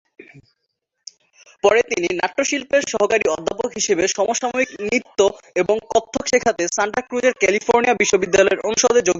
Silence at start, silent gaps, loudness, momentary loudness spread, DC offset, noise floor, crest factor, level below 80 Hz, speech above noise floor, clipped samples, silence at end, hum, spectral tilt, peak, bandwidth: 0.35 s; none; -18 LUFS; 6 LU; under 0.1%; -45 dBFS; 18 dB; -54 dBFS; 26 dB; under 0.1%; 0 s; none; -2.5 dB/octave; 0 dBFS; 8 kHz